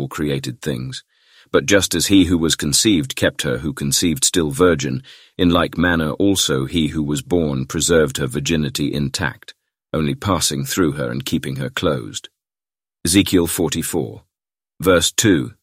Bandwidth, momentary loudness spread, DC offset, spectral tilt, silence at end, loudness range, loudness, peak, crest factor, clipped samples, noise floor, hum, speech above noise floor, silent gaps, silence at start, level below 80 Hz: 16 kHz; 11 LU; under 0.1%; -4 dB/octave; 0.1 s; 5 LU; -18 LUFS; -2 dBFS; 18 dB; under 0.1%; under -90 dBFS; none; over 72 dB; none; 0 s; -40 dBFS